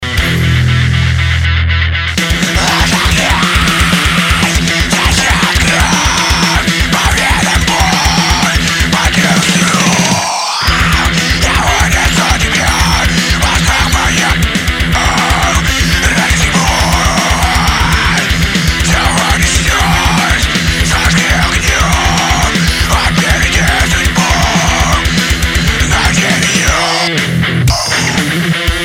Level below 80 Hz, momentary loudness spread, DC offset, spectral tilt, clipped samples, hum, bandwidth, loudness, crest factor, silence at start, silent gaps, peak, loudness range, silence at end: -18 dBFS; 2 LU; under 0.1%; -3.5 dB/octave; under 0.1%; none; 17 kHz; -10 LUFS; 10 dB; 0 s; none; 0 dBFS; 1 LU; 0 s